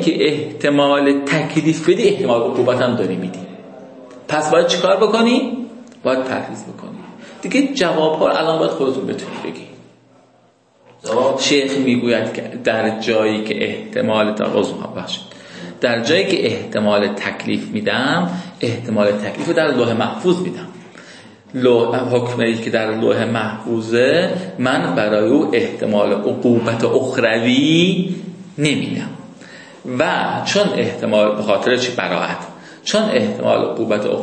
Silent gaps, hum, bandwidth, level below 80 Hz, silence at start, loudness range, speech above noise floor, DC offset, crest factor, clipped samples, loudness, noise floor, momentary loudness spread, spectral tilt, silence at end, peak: none; none; 8.8 kHz; -62 dBFS; 0 s; 3 LU; 37 dB; under 0.1%; 16 dB; under 0.1%; -17 LUFS; -54 dBFS; 14 LU; -5 dB/octave; 0 s; -2 dBFS